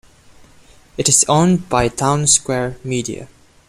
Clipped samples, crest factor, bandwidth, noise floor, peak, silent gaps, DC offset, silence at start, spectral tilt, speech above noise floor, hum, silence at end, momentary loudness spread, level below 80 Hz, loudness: under 0.1%; 18 dB; 15.5 kHz; -47 dBFS; 0 dBFS; none; under 0.1%; 1 s; -3.5 dB/octave; 30 dB; none; 0.45 s; 14 LU; -42 dBFS; -15 LUFS